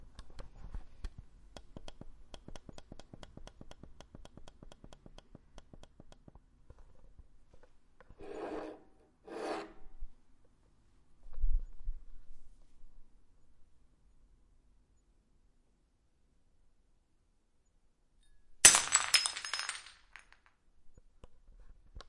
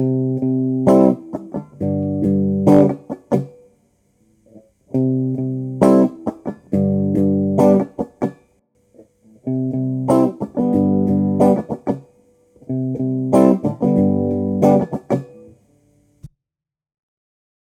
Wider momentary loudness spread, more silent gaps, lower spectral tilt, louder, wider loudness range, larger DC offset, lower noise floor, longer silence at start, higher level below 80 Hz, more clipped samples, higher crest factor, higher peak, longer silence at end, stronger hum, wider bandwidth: first, 32 LU vs 12 LU; neither; second, 0 dB/octave vs -10 dB/octave; second, -29 LUFS vs -18 LUFS; first, 26 LU vs 3 LU; neither; second, -72 dBFS vs -84 dBFS; about the same, 0 s vs 0 s; first, -48 dBFS vs -54 dBFS; neither; first, 34 dB vs 18 dB; second, -4 dBFS vs 0 dBFS; second, 0.05 s vs 1.45 s; neither; about the same, 11.5 kHz vs 12 kHz